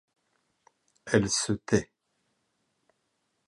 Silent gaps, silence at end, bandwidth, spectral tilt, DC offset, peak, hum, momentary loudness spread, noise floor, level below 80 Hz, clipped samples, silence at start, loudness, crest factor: none; 1.65 s; 11.5 kHz; -4 dB/octave; under 0.1%; -8 dBFS; none; 21 LU; -77 dBFS; -58 dBFS; under 0.1%; 1.05 s; -27 LUFS; 24 dB